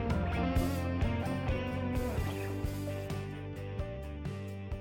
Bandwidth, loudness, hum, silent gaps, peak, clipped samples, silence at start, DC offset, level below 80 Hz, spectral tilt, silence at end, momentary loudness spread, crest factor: 17 kHz; -36 LUFS; none; none; -22 dBFS; under 0.1%; 0 s; under 0.1%; -42 dBFS; -7 dB/octave; 0 s; 9 LU; 14 dB